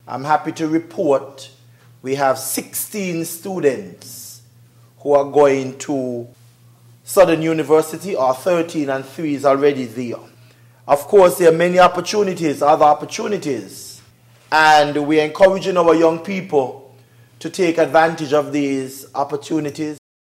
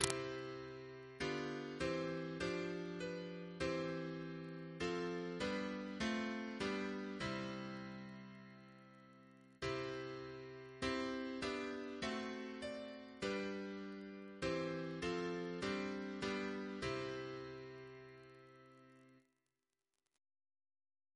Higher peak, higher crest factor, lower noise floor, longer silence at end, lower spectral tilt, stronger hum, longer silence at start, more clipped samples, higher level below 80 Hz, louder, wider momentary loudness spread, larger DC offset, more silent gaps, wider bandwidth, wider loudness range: first, -2 dBFS vs -12 dBFS; second, 16 dB vs 34 dB; second, -49 dBFS vs under -90 dBFS; second, 0.4 s vs 1.95 s; about the same, -4.5 dB/octave vs -4.5 dB/octave; neither; about the same, 0.05 s vs 0 s; neither; first, -56 dBFS vs -68 dBFS; first, -17 LUFS vs -44 LUFS; about the same, 16 LU vs 16 LU; neither; neither; first, 16 kHz vs 11 kHz; about the same, 6 LU vs 6 LU